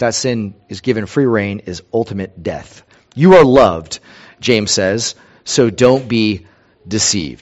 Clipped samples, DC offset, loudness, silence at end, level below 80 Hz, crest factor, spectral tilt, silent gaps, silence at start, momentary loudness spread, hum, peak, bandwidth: 0.3%; under 0.1%; -14 LUFS; 0.1 s; -44 dBFS; 14 dB; -4.5 dB/octave; none; 0 s; 17 LU; none; 0 dBFS; 8.2 kHz